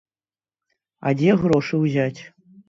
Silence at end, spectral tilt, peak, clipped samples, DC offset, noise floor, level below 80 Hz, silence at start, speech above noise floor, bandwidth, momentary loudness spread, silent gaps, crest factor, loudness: 0.4 s; -8 dB/octave; -6 dBFS; under 0.1%; under 0.1%; under -90 dBFS; -56 dBFS; 1 s; over 71 dB; 7.8 kHz; 9 LU; none; 18 dB; -20 LUFS